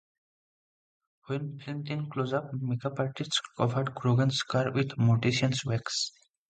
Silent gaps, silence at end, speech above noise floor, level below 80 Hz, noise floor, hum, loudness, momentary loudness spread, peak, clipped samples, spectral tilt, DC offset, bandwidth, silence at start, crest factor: none; 0.4 s; over 61 dB; -64 dBFS; under -90 dBFS; none; -30 LUFS; 9 LU; -12 dBFS; under 0.1%; -5.5 dB/octave; under 0.1%; 9.2 kHz; 1.3 s; 20 dB